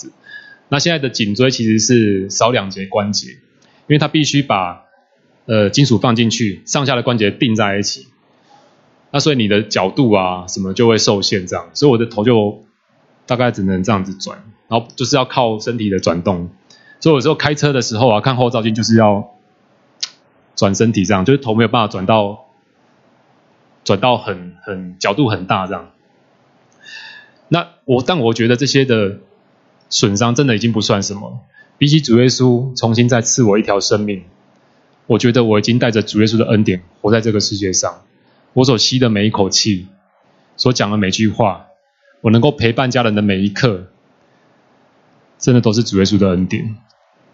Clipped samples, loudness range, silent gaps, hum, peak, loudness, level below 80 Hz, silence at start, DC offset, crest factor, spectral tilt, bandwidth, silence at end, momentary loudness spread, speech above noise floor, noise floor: under 0.1%; 4 LU; none; none; 0 dBFS; -15 LUFS; -52 dBFS; 0.05 s; under 0.1%; 16 dB; -5 dB/octave; 7.8 kHz; 0.55 s; 12 LU; 41 dB; -55 dBFS